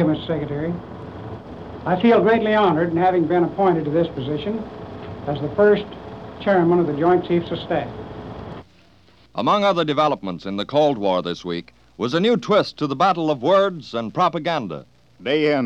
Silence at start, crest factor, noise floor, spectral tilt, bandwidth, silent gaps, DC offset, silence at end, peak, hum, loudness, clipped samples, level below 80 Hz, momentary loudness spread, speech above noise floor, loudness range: 0 s; 16 dB; -53 dBFS; -7 dB/octave; 8 kHz; none; 0.1%; 0 s; -6 dBFS; none; -20 LUFS; under 0.1%; -50 dBFS; 18 LU; 34 dB; 3 LU